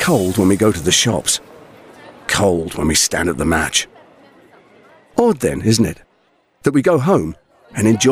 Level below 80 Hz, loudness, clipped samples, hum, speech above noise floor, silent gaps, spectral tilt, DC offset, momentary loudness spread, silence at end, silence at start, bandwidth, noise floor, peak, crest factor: -42 dBFS; -16 LUFS; under 0.1%; none; 43 dB; none; -4 dB/octave; under 0.1%; 8 LU; 0 s; 0 s; 16.5 kHz; -59 dBFS; -2 dBFS; 14 dB